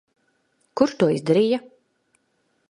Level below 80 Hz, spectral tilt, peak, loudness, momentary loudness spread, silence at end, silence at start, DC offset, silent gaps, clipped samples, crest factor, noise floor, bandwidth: -68 dBFS; -6.5 dB/octave; -4 dBFS; -21 LUFS; 8 LU; 1.1 s; 0.75 s; under 0.1%; none; under 0.1%; 20 dB; -69 dBFS; 11 kHz